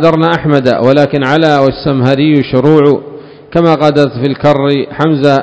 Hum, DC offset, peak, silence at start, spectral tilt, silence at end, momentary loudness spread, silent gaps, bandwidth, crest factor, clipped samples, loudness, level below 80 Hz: none; 0.3%; 0 dBFS; 0 s; -8 dB/octave; 0 s; 4 LU; none; 8 kHz; 8 dB; 2%; -10 LUFS; -42 dBFS